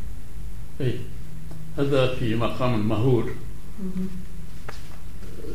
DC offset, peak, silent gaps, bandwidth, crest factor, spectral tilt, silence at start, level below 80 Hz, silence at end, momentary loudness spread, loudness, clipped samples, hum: 7%; -8 dBFS; none; 15.5 kHz; 18 dB; -7.5 dB/octave; 0 s; -40 dBFS; 0 s; 18 LU; -26 LUFS; under 0.1%; none